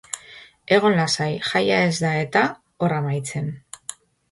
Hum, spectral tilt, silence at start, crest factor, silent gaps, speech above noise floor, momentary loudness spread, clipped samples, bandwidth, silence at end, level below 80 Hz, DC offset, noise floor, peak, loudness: none; -4.5 dB/octave; 0.15 s; 20 dB; none; 25 dB; 16 LU; under 0.1%; 11.5 kHz; 0.4 s; -60 dBFS; under 0.1%; -46 dBFS; -2 dBFS; -21 LUFS